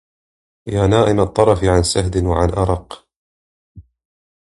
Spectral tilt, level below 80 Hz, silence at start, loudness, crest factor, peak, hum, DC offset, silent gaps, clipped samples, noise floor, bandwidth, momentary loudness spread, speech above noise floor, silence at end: -6 dB/octave; -30 dBFS; 0.65 s; -16 LUFS; 18 dB; 0 dBFS; none; under 0.1%; 3.16-3.75 s; under 0.1%; under -90 dBFS; 11.5 kHz; 15 LU; over 75 dB; 0.65 s